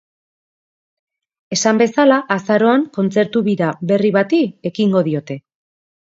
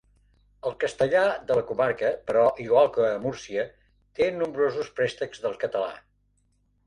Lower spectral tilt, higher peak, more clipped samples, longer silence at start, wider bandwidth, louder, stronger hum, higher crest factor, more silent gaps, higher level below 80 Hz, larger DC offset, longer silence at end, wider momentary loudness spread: about the same, -5.5 dB/octave vs -5.5 dB/octave; first, 0 dBFS vs -8 dBFS; neither; first, 1.5 s vs 0.65 s; second, 7.8 kHz vs 10.5 kHz; first, -16 LUFS vs -26 LUFS; second, none vs 50 Hz at -60 dBFS; about the same, 18 dB vs 18 dB; neither; second, -66 dBFS vs -60 dBFS; neither; second, 0.75 s vs 0.9 s; about the same, 8 LU vs 10 LU